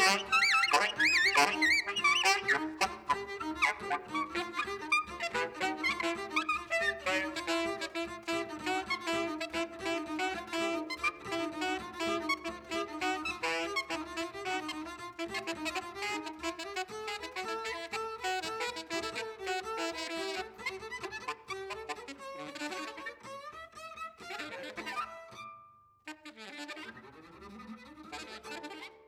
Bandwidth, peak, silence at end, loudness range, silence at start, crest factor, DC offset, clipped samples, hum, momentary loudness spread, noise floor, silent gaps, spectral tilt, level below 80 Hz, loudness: 19 kHz; -12 dBFS; 0.05 s; 14 LU; 0 s; 24 dB; under 0.1%; under 0.1%; none; 19 LU; -60 dBFS; none; -2 dB/octave; -64 dBFS; -33 LUFS